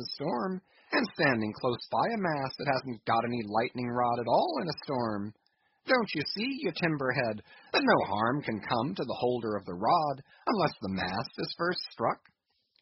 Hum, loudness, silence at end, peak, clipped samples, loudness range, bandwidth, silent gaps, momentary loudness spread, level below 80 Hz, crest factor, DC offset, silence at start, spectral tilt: none; -31 LUFS; 0.65 s; -10 dBFS; under 0.1%; 2 LU; 6 kHz; none; 7 LU; -68 dBFS; 20 dB; under 0.1%; 0 s; -3.5 dB/octave